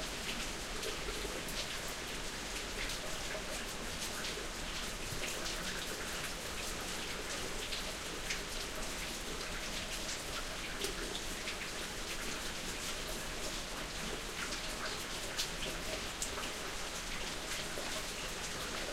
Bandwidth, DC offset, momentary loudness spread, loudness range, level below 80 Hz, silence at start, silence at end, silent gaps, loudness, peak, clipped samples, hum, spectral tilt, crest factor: 16 kHz; under 0.1%; 2 LU; 1 LU; -48 dBFS; 0 s; 0 s; none; -39 LUFS; -18 dBFS; under 0.1%; none; -2 dB/octave; 22 dB